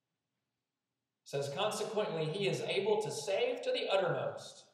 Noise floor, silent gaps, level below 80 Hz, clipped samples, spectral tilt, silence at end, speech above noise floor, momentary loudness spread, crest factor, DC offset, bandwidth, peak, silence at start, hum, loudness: under -90 dBFS; none; under -90 dBFS; under 0.1%; -4 dB/octave; 0.1 s; over 55 dB; 7 LU; 18 dB; under 0.1%; 14.5 kHz; -20 dBFS; 1.25 s; none; -35 LUFS